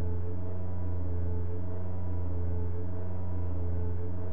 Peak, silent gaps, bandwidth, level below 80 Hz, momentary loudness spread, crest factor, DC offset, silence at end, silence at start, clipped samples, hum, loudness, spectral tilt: -20 dBFS; none; 2.5 kHz; -44 dBFS; 3 LU; 8 dB; 5%; 0 s; 0 s; under 0.1%; 60 Hz at -55 dBFS; -36 LUFS; -12 dB/octave